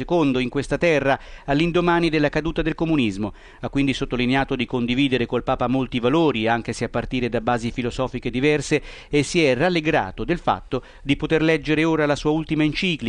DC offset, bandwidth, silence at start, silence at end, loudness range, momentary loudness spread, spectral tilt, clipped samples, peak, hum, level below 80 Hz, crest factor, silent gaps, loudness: under 0.1%; 10.5 kHz; 0 s; 0 s; 2 LU; 7 LU; -6 dB/octave; under 0.1%; -6 dBFS; none; -40 dBFS; 16 dB; none; -21 LUFS